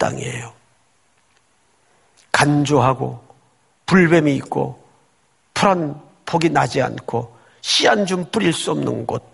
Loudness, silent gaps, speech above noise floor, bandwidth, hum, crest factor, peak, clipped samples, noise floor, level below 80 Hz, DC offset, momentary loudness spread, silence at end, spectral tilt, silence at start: -18 LUFS; none; 43 dB; 11.5 kHz; none; 20 dB; 0 dBFS; under 0.1%; -61 dBFS; -52 dBFS; under 0.1%; 14 LU; 0.15 s; -5 dB/octave; 0 s